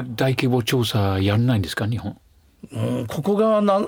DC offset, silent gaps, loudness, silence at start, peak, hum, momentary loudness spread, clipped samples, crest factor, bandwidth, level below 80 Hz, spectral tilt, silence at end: under 0.1%; none; -21 LUFS; 0 s; -4 dBFS; none; 10 LU; under 0.1%; 16 dB; over 20 kHz; -54 dBFS; -6.5 dB/octave; 0 s